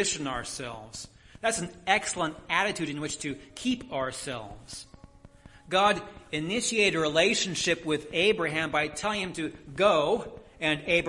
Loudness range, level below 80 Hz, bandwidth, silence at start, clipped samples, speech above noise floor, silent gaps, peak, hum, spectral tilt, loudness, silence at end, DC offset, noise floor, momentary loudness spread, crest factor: 6 LU; -56 dBFS; 11.5 kHz; 0 s; under 0.1%; 24 dB; none; -8 dBFS; none; -3 dB/octave; -28 LUFS; 0 s; under 0.1%; -53 dBFS; 15 LU; 22 dB